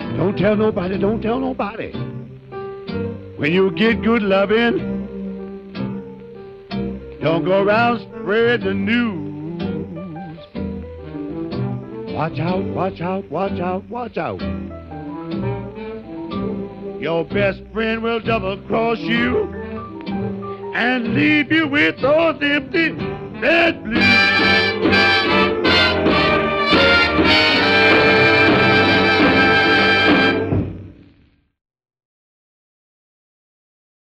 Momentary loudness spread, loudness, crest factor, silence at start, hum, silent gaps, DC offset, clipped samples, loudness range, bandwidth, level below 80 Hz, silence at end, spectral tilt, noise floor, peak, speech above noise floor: 18 LU; -17 LUFS; 16 dB; 0 s; none; none; under 0.1%; under 0.1%; 12 LU; 10.5 kHz; -42 dBFS; 3.25 s; -6 dB/octave; -55 dBFS; -2 dBFS; 37 dB